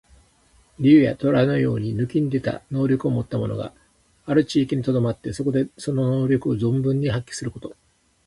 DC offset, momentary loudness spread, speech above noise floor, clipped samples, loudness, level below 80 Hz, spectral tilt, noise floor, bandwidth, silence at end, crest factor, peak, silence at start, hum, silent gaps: under 0.1%; 14 LU; 37 dB; under 0.1%; -22 LUFS; -52 dBFS; -7.5 dB/octave; -58 dBFS; 11.5 kHz; 0.55 s; 18 dB; -4 dBFS; 0.8 s; none; none